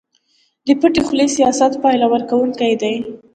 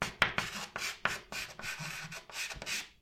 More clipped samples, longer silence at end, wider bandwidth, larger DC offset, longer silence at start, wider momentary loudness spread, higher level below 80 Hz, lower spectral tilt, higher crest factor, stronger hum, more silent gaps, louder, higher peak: neither; about the same, 0.15 s vs 0.1 s; second, 9.4 kHz vs 16.5 kHz; neither; first, 0.65 s vs 0 s; second, 6 LU vs 10 LU; first, -52 dBFS vs -58 dBFS; first, -4 dB/octave vs -1.5 dB/octave; second, 16 dB vs 30 dB; neither; neither; first, -15 LUFS vs -36 LUFS; first, 0 dBFS vs -8 dBFS